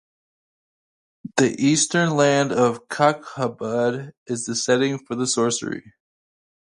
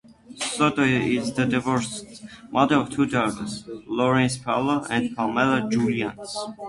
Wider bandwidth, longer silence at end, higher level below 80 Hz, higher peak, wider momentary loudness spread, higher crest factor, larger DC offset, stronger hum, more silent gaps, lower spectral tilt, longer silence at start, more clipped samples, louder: about the same, 11.5 kHz vs 11.5 kHz; first, 0.85 s vs 0 s; second, -66 dBFS vs -54 dBFS; about the same, -2 dBFS vs -4 dBFS; about the same, 11 LU vs 12 LU; about the same, 20 dB vs 18 dB; neither; neither; first, 4.17-4.26 s vs none; about the same, -4 dB/octave vs -5 dB/octave; first, 1.25 s vs 0.3 s; neither; about the same, -21 LUFS vs -23 LUFS